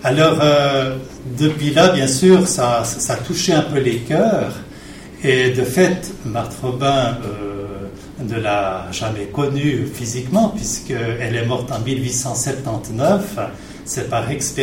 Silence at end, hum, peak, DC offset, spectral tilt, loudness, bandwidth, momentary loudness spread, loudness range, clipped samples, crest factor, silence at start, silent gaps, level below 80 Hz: 0 s; none; -2 dBFS; under 0.1%; -4.5 dB/octave; -18 LUFS; 16.5 kHz; 14 LU; 6 LU; under 0.1%; 16 dB; 0 s; none; -42 dBFS